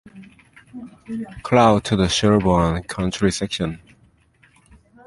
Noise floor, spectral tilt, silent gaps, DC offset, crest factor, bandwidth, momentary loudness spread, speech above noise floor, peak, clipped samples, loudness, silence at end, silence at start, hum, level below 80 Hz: -56 dBFS; -5.5 dB/octave; none; under 0.1%; 20 dB; 11.5 kHz; 23 LU; 37 dB; -2 dBFS; under 0.1%; -19 LUFS; 1.3 s; 0.15 s; none; -40 dBFS